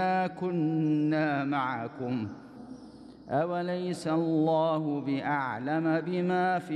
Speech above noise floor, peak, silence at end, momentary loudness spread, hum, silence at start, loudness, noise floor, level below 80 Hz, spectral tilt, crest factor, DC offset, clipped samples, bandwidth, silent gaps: 20 dB; -16 dBFS; 0 s; 17 LU; none; 0 s; -29 LUFS; -49 dBFS; -72 dBFS; -7.5 dB/octave; 12 dB; under 0.1%; under 0.1%; 11 kHz; none